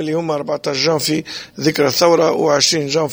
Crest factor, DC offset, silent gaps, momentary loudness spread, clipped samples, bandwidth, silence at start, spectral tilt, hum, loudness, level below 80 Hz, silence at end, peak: 16 dB; under 0.1%; none; 8 LU; under 0.1%; over 20 kHz; 0 s; -3.5 dB/octave; none; -16 LUFS; -58 dBFS; 0 s; 0 dBFS